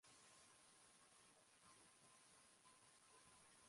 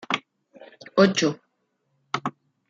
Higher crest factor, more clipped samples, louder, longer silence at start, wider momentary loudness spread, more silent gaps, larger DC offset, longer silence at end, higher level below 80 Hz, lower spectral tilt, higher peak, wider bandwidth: second, 16 dB vs 24 dB; neither; second, -69 LUFS vs -24 LUFS; about the same, 0 s vs 0.1 s; second, 2 LU vs 14 LU; neither; neither; second, 0 s vs 0.4 s; second, under -90 dBFS vs -70 dBFS; second, -1 dB/octave vs -4.5 dB/octave; second, -56 dBFS vs -4 dBFS; first, 11.5 kHz vs 7.6 kHz